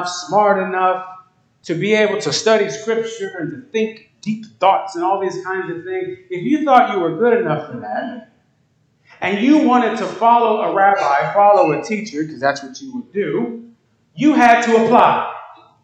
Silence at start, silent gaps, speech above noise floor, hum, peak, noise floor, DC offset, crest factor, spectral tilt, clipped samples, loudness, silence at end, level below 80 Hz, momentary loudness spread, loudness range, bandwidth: 0 s; none; 44 dB; none; 0 dBFS; -60 dBFS; under 0.1%; 16 dB; -5 dB/octave; under 0.1%; -16 LUFS; 0.3 s; -66 dBFS; 14 LU; 5 LU; 9 kHz